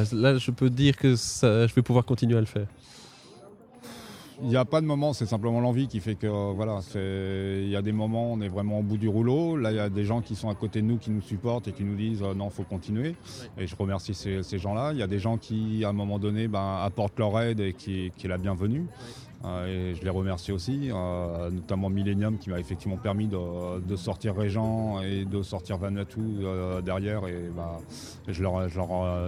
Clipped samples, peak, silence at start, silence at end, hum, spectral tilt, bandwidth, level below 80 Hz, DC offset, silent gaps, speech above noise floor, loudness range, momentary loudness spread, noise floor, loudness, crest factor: under 0.1%; -8 dBFS; 0 s; 0 s; none; -7 dB/octave; 13.5 kHz; -52 dBFS; under 0.1%; none; 23 dB; 4 LU; 11 LU; -50 dBFS; -29 LUFS; 20 dB